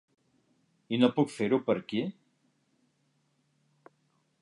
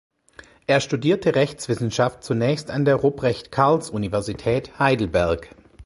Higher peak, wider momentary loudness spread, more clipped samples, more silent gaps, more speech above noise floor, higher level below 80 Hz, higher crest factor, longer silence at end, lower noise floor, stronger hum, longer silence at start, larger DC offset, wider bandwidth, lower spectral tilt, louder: second, -10 dBFS vs -2 dBFS; first, 9 LU vs 6 LU; neither; neither; first, 45 dB vs 28 dB; second, -78 dBFS vs -46 dBFS; about the same, 24 dB vs 20 dB; first, 2.3 s vs 0 s; first, -73 dBFS vs -49 dBFS; neither; first, 0.9 s vs 0.7 s; neither; about the same, 11 kHz vs 11.5 kHz; about the same, -6.5 dB/octave vs -6 dB/octave; second, -29 LUFS vs -22 LUFS